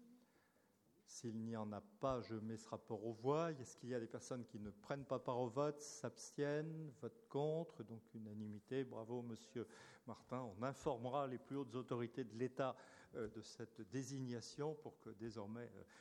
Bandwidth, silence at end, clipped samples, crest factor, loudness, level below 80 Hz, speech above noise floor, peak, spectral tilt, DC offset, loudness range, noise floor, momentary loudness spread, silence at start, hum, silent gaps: 18 kHz; 0 s; under 0.1%; 20 dB; -48 LUFS; -78 dBFS; 30 dB; -28 dBFS; -6 dB/octave; under 0.1%; 4 LU; -77 dBFS; 12 LU; 0 s; none; none